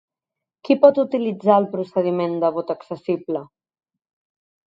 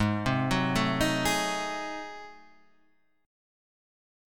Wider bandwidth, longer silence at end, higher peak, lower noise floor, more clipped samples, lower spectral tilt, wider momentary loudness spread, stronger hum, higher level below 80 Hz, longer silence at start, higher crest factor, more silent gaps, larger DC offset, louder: second, 5.6 kHz vs 18 kHz; first, 1.25 s vs 1 s; first, 0 dBFS vs -14 dBFS; first, -86 dBFS vs -70 dBFS; neither; first, -9 dB/octave vs -4.5 dB/octave; second, 13 LU vs 16 LU; neither; second, -72 dBFS vs -48 dBFS; first, 0.65 s vs 0 s; about the same, 20 dB vs 18 dB; neither; second, under 0.1% vs 0.3%; first, -20 LUFS vs -28 LUFS